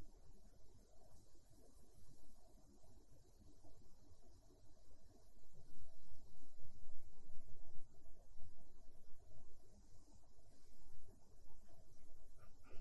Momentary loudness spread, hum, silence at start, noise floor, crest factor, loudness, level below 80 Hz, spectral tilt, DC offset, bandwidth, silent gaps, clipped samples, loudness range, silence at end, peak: 3 LU; none; 0 s; -61 dBFS; 12 dB; -69 LUFS; -64 dBFS; -5.5 dB/octave; under 0.1%; 12 kHz; none; under 0.1%; 1 LU; 0 s; -28 dBFS